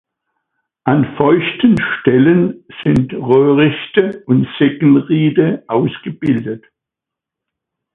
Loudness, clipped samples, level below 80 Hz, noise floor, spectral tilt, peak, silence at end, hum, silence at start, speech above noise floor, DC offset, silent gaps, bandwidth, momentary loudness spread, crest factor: -14 LUFS; under 0.1%; -48 dBFS; -84 dBFS; -9 dB/octave; 0 dBFS; 1.35 s; none; 0.85 s; 71 dB; under 0.1%; none; 4 kHz; 9 LU; 14 dB